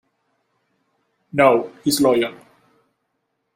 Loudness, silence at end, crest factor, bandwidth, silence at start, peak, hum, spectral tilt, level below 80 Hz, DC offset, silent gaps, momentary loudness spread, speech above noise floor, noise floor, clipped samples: -18 LUFS; 1.2 s; 20 dB; 16 kHz; 1.35 s; -2 dBFS; none; -4 dB/octave; -62 dBFS; under 0.1%; none; 10 LU; 56 dB; -73 dBFS; under 0.1%